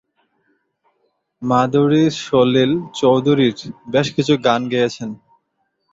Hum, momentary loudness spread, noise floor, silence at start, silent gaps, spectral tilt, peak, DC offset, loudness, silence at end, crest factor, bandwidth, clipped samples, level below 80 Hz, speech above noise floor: none; 14 LU; -70 dBFS; 1.4 s; none; -6 dB/octave; -2 dBFS; under 0.1%; -17 LUFS; 0.75 s; 16 dB; 7.8 kHz; under 0.1%; -56 dBFS; 54 dB